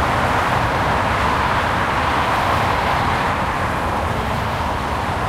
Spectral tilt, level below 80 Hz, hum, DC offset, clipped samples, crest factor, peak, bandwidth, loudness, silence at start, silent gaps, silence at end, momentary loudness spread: -5 dB/octave; -30 dBFS; none; under 0.1%; under 0.1%; 14 dB; -4 dBFS; 16 kHz; -18 LUFS; 0 s; none; 0 s; 4 LU